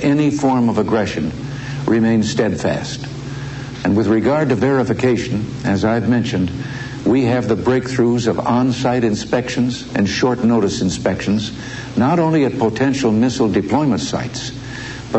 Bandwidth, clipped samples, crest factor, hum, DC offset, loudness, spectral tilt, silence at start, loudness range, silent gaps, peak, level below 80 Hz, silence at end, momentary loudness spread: 8.4 kHz; under 0.1%; 14 dB; none; under 0.1%; -17 LUFS; -6 dB/octave; 0 s; 1 LU; none; -2 dBFS; -44 dBFS; 0 s; 11 LU